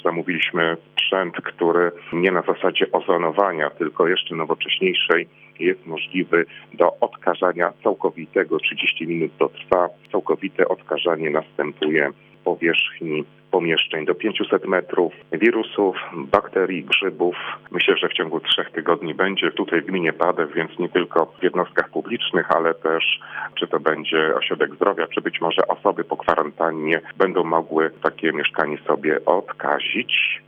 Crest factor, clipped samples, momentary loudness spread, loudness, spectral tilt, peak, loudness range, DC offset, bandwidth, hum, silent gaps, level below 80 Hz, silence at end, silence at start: 20 dB; under 0.1%; 5 LU; -21 LUFS; -6.5 dB/octave; -2 dBFS; 1 LU; under 0.1%; 5.4 kHz; none; none; -64 dBFS; 0.05 s; 0.05 s